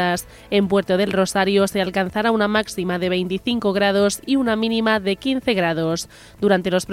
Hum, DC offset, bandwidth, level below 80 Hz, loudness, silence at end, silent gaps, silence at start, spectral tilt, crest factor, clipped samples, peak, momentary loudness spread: none; under 0.1%; 16 kHz; -50 dBFS; -20 LUFS; 0 s; none; 0 s; -5 dB/octave; 16 dB; under 0.1%; -4 dBFS; 5 LU